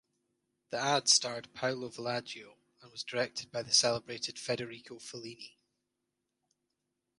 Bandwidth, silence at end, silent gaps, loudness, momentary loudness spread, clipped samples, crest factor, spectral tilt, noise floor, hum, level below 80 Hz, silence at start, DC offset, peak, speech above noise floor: 11.5 kHz; 1.7 s; none; -31 LUFS; 20 LU; under 0.1%; 24 dB; -1.5 dB/octave; -85 dBFS; none; -78 dBFS; 0.7 s; under 0.1%; -12 dBFS; 51 dB